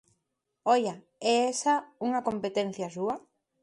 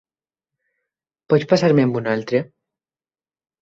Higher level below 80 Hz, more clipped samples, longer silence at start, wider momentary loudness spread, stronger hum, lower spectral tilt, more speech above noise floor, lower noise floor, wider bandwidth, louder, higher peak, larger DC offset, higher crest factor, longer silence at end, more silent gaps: second, -72 dBFS vs -62 dBFS; neither; second, 0.65 s vs 1.3 s; about the same, 8 LU vs 8 LU; neither; second, -3.5 dB/octave vs -7 dB/octave; second, 53 dB vs over 73 dB; second, -82 dBFS vs under -90 dBFS; first, 11.5 kHz vs 7.8 kHz; second, -29 LUFS vs -18 LUFS; second, -10 dBFS vs -2 dBFS; neither; about the same, 20 dB vs 20 dB; second, 0.45 s vs 1.15 s; neither